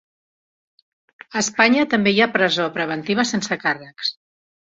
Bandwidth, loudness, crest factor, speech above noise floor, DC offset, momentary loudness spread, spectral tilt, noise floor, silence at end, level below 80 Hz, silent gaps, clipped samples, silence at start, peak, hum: 8 kHz; -19 LUFS; 20 dB; over 71 dB; under 0.1%; 10 LU; -3.5 dB/octave; under -90 dBFS; 0.65 s; -62 dBFS; none; under 0.1%; 1.3 s; -2 dBFS; none